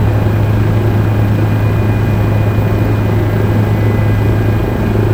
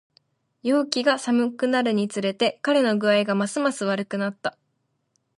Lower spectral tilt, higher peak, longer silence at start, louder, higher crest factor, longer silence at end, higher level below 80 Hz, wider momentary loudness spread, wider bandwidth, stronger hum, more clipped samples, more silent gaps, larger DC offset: first, -8.5 dB/octave vs -4.5 dB/octave; first, 0 dBFS vs -4 dBFS; second, 0 s vs 0.65 s; first, -13 LUFS vs -23 LUFS; second, 12 dB vs 20 dB; second, 0 s vs 0.9 s; first, -22 dBFS vs -76 dBFS; second, 1 LU vs 7 LU; first, 16 kHz vs 11.5 kHz; neither; neither; neither; first, 0.6% vs under 0.1%